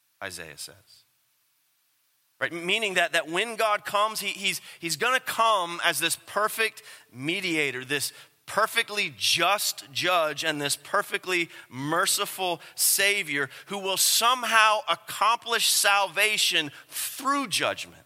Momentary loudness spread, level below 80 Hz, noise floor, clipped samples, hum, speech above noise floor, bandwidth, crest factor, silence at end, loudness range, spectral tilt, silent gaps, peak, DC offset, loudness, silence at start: 12 LU; -78 dBFS; -70 dBFS; under 0.1%; none; 43 dB; 16.5 kHz; 22 dB; 0.15 s; 5 LU; -1 dB/octave; none; -4 dBFS; under 0.1%; -24 LUFS; 0.2 s